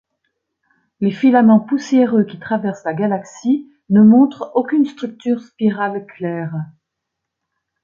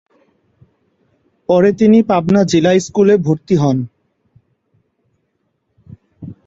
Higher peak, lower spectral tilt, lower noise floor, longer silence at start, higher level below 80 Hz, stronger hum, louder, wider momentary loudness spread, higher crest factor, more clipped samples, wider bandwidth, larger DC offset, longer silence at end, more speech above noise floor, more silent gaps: about the same, -2 dBFS vs -2 dBFS; about the same, -8 dB/octave vs -7 dB/octave; first, -79 dBFS vs -67 dBFS; second, 1 s vs 1.5 s; second, -62 dBFS vs -52 dBFS; neither; second, -16 LUFS vs -13 LUFS; second, 14 LU vs 19 LU; about the same, 14 dB vs 14 dB; neither; about the same, 7.2 kHz vs 7.8 kHz; neither; first, 1.2 s vs 0.15 s; first, 63 dB vs 55 dB; neither